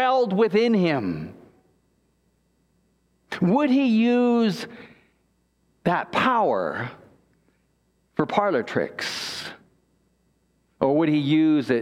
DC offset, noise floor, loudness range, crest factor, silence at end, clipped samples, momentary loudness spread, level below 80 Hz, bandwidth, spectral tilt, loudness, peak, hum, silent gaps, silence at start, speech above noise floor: under 0.1%; -67 dBFS; 6 LU; 20 dB; 0 s; under 0.1%; 14 LU; -64 dBFS; 13 kHz; -6.5 dB/octave; -22 LUFS; -4 dBFS; none; none; 0 s; 46 dB